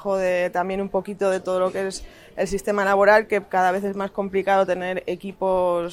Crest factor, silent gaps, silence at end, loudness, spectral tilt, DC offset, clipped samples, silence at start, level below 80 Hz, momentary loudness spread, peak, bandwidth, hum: 18 dB; none; 0 s; -22 LUFS; -5 dB/octave; under 0.1%; under 0.1%; 0 s; -50 dBFS; 11 LU; -4 dBFS; 15 kHz; none